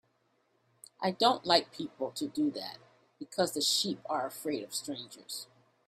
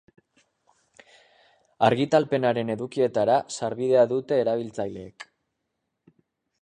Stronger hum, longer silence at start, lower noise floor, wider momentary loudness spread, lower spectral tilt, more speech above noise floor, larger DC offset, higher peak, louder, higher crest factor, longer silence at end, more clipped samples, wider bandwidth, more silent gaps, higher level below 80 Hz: neither; second, 1 s vs 1.8 s; second, -74 dBFS vs -80 dBFS; about the same, 15 LU vs 15 LU; second, -3 dB/octave vs -6 dB/octave; second, 41 dB vs 56 dB; neither; second, -10 dBFS vs -6 dBFS; second, -32 LUFS vs -24 LUFS; about the same, 24 dB vs 20 dB; second, 0.45 s vs 1.4 s; neither; first, 16 kHz vs 10 kHz; neither; second, -78 dBFS vs -66 dBFS